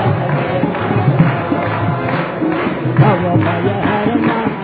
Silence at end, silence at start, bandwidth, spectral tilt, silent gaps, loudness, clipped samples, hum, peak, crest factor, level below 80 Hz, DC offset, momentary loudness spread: 0 s; 0 s; 4.9 kHz; -11.5 dB/octave; none; -15 LUFS; under 0.1%; none; 0 dBFS; 14 dB; -44 dBFS; under 0.1%; 5 LU